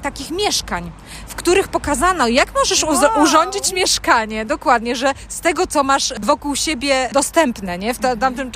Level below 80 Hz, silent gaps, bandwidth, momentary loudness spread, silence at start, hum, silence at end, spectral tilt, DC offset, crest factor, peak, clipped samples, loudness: -38 dBFS; none; 15.5 kHz; 9 LU; 0 s; none; 0 s; -2.5 dB/octave; under 0.1%; 16 dB; -2 dBFS; under 0.1%; -17 LUFS